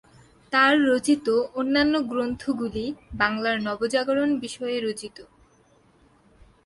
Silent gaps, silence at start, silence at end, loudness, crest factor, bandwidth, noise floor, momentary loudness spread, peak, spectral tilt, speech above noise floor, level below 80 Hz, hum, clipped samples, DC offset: none; 0.5 s; 1.4 s; -24 LUFS; 20 dB; 11.5 kHz; -59 dBFS; 11 LU; -6 dBFS; -4 dB/octave; 36 dB; -54 dBFS; none; under 0.1%; under 0.1%